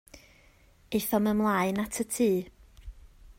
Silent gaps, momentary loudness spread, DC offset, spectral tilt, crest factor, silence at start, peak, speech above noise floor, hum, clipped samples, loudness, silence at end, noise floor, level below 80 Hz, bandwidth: none; 7 LU; under 0.1%; -5 dB/octave; 16 dB; 0.15 s; -14 dBFS; 32 dB; none; under 0.1%; -28 LUFS; 0.05 s; -59 dBFS; -54 dBFS; 16.5 kHz